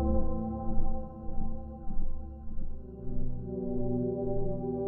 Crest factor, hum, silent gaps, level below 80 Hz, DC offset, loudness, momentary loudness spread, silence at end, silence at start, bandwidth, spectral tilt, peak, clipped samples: 14 dB; none; none; -32 dBFS; under 0.1%; -37 LUFS; 12 LU; 0 s; 0 s; 1.4 kHz; -14.5 dB/octave; -14 dBFS; under 0.1%